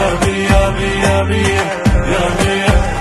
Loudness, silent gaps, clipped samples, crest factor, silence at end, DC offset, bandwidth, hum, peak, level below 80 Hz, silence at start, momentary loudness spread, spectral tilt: -14 LUFS; none; under 0.1%; 12 dB; 0 s; under 0.1%; 12.5 kHz; none; 0 dBFS; -20 dBFS; 0 s; 2 LU; -5 dB/octave